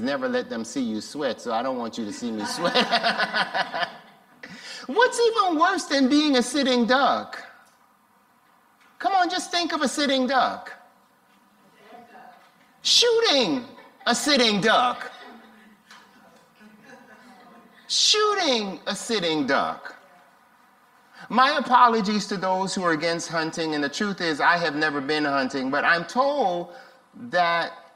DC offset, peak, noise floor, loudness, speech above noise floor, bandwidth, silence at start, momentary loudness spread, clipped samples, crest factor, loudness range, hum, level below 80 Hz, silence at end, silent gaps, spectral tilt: under 0.1%; -4 dBFS; -60 dBFS; -22 LUFS; 38 dB; 16 kHz; 0 s; 12 LU; under 0.1%; 22 dB; 5 LU; none; -70 dBFS; 0.15 s; none; -2.5 dB/octave